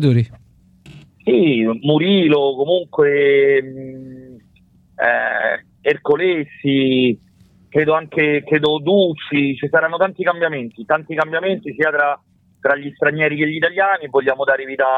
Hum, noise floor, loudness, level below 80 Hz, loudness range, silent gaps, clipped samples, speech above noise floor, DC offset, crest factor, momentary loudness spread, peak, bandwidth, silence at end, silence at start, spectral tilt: none; -52 dBFS; -17 LUFS; -60 dBFS; 3 LU; none; under 0.1%; 36 dB; under 0.1%; 14 dB; 7 LU; -4 dBFS; 4.6 kHz; 0 s; 0 s; -8 dB/octave